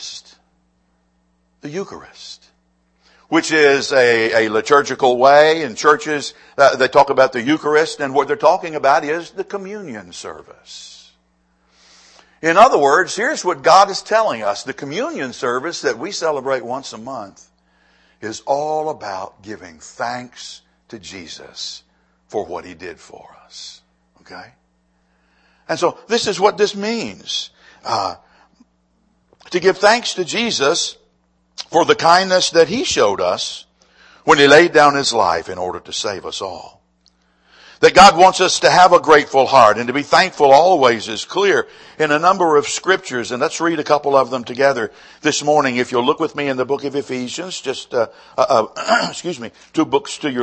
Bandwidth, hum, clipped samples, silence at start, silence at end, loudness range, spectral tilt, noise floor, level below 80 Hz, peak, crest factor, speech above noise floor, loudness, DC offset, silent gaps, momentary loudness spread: 11 kHz; none; under 0.1%; 0 s; 0 s; 16 LU; -3 dB/octave; -62 dBFS; -54 dBFS; 0 dBFS; 16 dB; 46 dB; -15 LUFS; under 0.1%; none; 21 LU